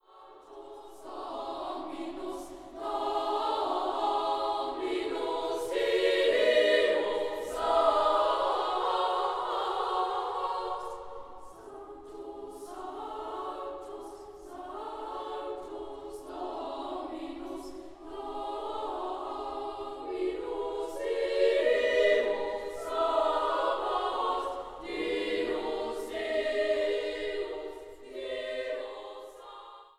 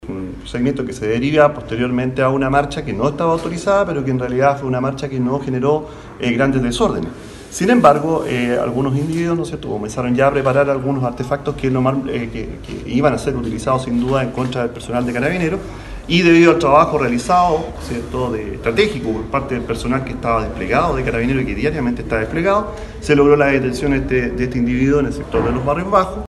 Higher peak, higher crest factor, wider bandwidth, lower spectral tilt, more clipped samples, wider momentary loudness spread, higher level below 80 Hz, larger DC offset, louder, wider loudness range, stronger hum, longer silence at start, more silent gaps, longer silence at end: second, -12 dBFS vs 0 dBFS; about the same, 18 dB vs 16 dB; first, 14.5 kHz vs 12.5 kHz; second, -3 dB/octave vs -6.5 dB/octave; neither; first, 19 LU vs 10 LU; second, -60 dBFS vs -34 dBFS; neither; second, -31 LUFS vs -17 LUFS; first, 13 LU vs 4 LU; neither; first, 0.15 s vs 0 s; neither; about the same, 0.1 s vs 0.05 s